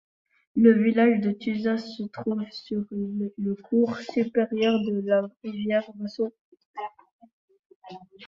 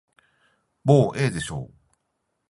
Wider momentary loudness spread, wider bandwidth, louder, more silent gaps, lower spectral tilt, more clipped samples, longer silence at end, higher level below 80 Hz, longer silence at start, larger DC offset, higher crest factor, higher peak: about the same, 18 LU vs 17 LU; second, 7 kHz vs 11.5 kHz; second, -25 LUFS vs -22 LUFS; first, 6.41-6.52 s, 6.65-6.74 s, 7.12-7.19 s, 7.33-7.48 s, 7.59-7.70 s, 7.76-7.82 s vs none; about the same, -7.5 dB/octave vs -6.5 dB/octave; neither; second, 0 s vs 0.85 s; second, -68 dBFS vs -54 dBFS; second, 0.55 s vs 0.85 s; neither; about the same, 20 dB vs 22 dB; second, -6 dBFS vs -2 dBFS